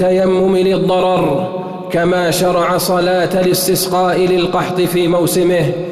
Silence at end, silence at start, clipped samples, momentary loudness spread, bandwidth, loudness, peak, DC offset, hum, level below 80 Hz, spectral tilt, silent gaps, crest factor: 0 s; 0 s; under 0.1%; 4 LU; 14 kHz; -14 LUFS; -4 dBFS; under 0.1%; none; -44 dBFS; -5 dB/octave; none; 8 dB